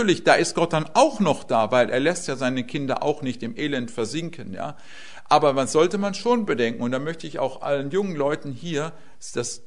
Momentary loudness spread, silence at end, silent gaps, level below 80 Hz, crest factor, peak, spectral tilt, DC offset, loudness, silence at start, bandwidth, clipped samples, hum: 14 LU; 0.1 s; none; -60 dBFS; 22 dB; 0 dBFS; -4.5 dB/octave; 1%; -23 LUFS; 0 s; 11 kHz; under 0.1%; none